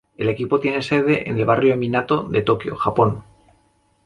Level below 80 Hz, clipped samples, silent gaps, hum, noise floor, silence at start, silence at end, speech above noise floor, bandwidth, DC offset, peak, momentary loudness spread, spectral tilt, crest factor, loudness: -50 dBFS; under 0.1%; none; none; -61 dBFS; 0.2 s; 0.85 s; 42 dB; 10.5 kHz; under 0.1%; -2 dBFS; 5 LU; -7.5 dB/octave; 18 dB; -19 LUFS